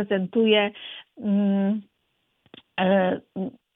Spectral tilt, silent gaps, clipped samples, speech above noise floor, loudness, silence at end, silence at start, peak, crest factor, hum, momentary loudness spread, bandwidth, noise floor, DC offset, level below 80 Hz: -10 dB/octave; none; under 0.1%; 49 dB; -24 LUFS; 0.25 s; 0 s; -6 dBFS; 18 dB; none; 14 LU; 3.9 kHz; -73 dBFS; under 0.1%; -70 dBFS